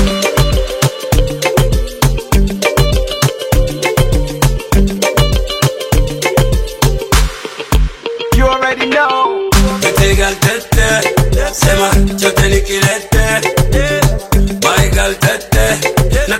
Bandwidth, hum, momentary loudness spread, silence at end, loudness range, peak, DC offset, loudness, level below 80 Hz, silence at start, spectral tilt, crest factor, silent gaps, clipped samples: 17 kHz; none; 4 LU; 0 s; 2 LU; 0 dBFS; under 0.1%; -13 LUFS; -16 dBFS; 0 s; -4.5 dB/octave; 12 dB; none; 0.1%